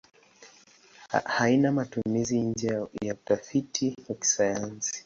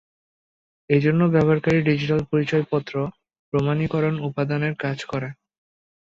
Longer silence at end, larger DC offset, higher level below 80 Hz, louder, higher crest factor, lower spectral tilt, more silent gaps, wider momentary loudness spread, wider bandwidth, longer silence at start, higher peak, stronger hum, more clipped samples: second, 0.05 s vs 0.8 s; neither; second, -62 dBFS vs -54 dBFS; second, -28 LUFS vs -22 LUFS; about the same, 18 dB vs 18 dB; second, -4 dB/octave vs -8 dB/octave; second, none vs 3.39-3.52 s; about the same, 8 LU vs 10 LU; about the same, 8 kHz vs 7.4 kHz; second, 0.4 s vs 0.9 s; second, -10 dBFS vs -6 dBFS; neither; neither